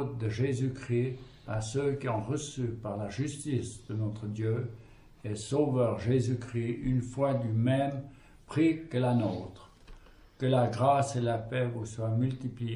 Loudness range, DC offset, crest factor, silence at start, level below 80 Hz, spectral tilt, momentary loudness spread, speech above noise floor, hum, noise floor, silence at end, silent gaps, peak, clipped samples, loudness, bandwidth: 4 LU; under 0.1%; 18 dB; 0 s; -56 dBFS; -7 dB/octave; 9 LU; 22 dB; none; -53 dBFS; 0 s; none; -12 dBFS; under 0.1%; -31 LUFS; 11.5 kHz